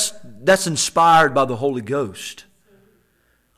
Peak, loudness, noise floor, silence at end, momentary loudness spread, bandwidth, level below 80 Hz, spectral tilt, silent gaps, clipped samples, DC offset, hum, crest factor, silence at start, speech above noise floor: -6 dBFS; -17 LUFS; -63 dBFS; 1.15 s; 14 LU; 16 kHz; -58 dBFS; -3 dB/octave; none; under 0.1%; under 0.1%; none; 14 dB; 0 s; 45 dB